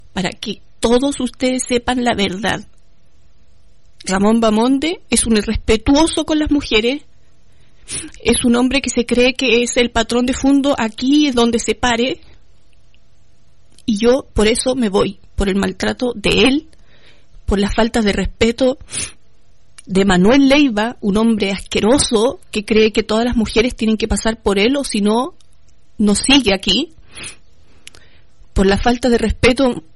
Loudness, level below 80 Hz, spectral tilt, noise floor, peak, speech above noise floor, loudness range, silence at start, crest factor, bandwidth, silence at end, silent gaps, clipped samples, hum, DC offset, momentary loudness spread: -15 LUFS; -32 dBFS; -4 dB/octave; -54 dBFS; -2 dBFS; 39 dB; 4 LU; 0.15 s; 14 dB; 12 kHz; 0.15 s; none; under 0.1%; none; 1%; 10 LU